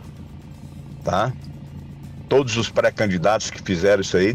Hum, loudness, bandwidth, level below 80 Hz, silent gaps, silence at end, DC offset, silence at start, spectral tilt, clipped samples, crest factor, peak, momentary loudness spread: none; -21 LUFS; 14.5 kHz; -46 dBFS; none; 0 s; under 0.1%; 0 s; -5 dB/octave; under 0.1%; 14 dB; -8 dBFS; 21 LU